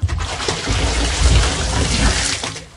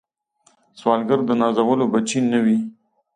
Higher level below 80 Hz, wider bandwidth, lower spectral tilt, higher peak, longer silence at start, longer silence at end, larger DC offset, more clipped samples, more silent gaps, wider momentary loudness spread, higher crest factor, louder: first, -20 dBFS vs -68 dBFS; first, 11.5 kHz vs 10 kHz; second, -3.5 dB/octave vs -5.5 dB/octave; about the same, -2 dBFS vs -4 dBFS; second, 0 s vs 0.75 s; second, 0.05 s vs 0.45 s; neither; neither; neither; about the same, 6 LU vs 5 LU; about the same, 16 dB vs 16 dB; about the same, -18 LUFS vs -19 LUFS